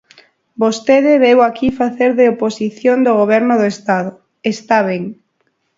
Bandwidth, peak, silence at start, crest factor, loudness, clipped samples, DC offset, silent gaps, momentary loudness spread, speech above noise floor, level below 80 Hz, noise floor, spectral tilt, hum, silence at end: 7.8 kHz; 0 dBFS; 0.6 s; 14 dB; -14 LUFS; under 0.1%; under 0.1%; none; 11 LU; 52 dB; -52 dBFS; -65 dBFS; -5.5 dB/octave; none; 0.65 s